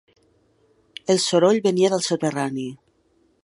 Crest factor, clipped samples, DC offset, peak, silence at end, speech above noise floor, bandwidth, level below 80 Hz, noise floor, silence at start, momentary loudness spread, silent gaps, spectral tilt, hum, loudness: 18 dB; under 0.1%; under 0.1%; -4 dBFS; 0.7 s; 43 dB; 11.5 kHz; -70 dBFS; -63 dBFS; 1.1 s; 16 LU; none; -4.5 dB/octave; none; -20 LUFS